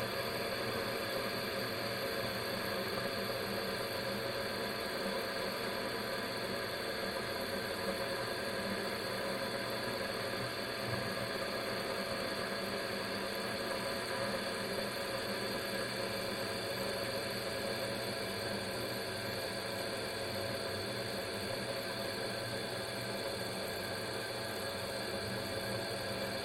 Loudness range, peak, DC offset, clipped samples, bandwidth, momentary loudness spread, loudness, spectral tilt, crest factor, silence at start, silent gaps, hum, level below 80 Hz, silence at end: 1 LU; -22 dBFS; under 0.1%; under 0.1%; 16 kHz; 2 LU; -37 LUFS; -3.5 dB/octave; 16 dB; 0 s; none; none; -64 dBFS; 0 s